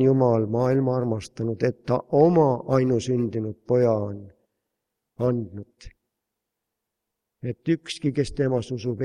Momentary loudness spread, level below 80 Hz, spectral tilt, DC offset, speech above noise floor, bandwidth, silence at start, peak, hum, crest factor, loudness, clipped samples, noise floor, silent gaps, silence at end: 12 LU; -54 dBFS; -8 dB/octave; under 0.1%; 60 dB; 11 kHz; 0 s; -6 dBFS; none; 20 dB; -24 LUFS; under 0.1%; -83 dBFS; none; 0 s